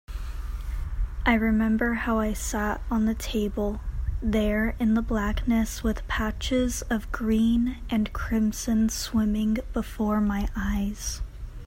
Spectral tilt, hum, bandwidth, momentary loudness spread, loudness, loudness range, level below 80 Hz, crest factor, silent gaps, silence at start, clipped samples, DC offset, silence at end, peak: -5 dB/octave; none; 16.5 kHz; 10 LU; -27 LUFS; 1 LU; -34 dBFS; 18 dB; none; 0.1 s; under 0.1%; under 0.1%; 0 s; -8 dBFS